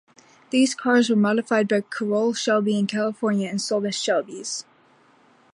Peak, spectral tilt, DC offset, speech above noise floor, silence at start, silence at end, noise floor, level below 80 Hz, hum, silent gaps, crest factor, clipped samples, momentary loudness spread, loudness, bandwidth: -8 dBFS; -4.5 dB/octave; under 0.1%; 35 dB; 0.5 s; 0.9 s; -57 dBFS; -74 dBFS; none; none; 16 dB; under 0.1%; 6 LU; -22 LUFS; 11 kHz